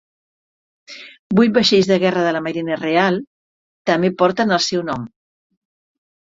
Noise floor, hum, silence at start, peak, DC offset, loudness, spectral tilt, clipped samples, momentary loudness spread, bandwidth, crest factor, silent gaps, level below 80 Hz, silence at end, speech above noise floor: under -90 dBFS; none; 0.9 s; -2 dBFS; under 0.1%; -17 LUFS; -5 dB/octave; under 0.1%; 14 LU; 7.8 kHz; 18 dB; 1.19-1.30 s, 3.27-3.85 s; -58 dBFS; 1.2 s; over 74 dB